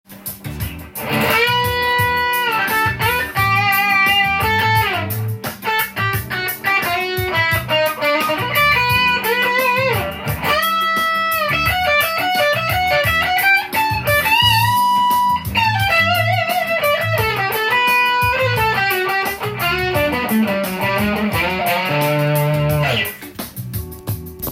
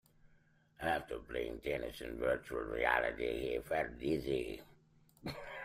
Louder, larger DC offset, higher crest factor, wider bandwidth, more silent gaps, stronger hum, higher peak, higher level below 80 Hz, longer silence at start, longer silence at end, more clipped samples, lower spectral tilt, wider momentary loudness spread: first, -16 LUFS vs -38 LUFS; neither; second, 14 dB vs 24 dB; about the same, 17 kHz vs 16 kHz; neither; neither; first, -2 dBFS vs -16 dBFS; first, -40 dBFS vs -56 dBFS; second, 0.1 s vs 0.8 s; about the same, 0 s vs 0 s; neither; second, -4 dB/octave vs -5.5 dB/octave; second, 9 LU vs 12 LU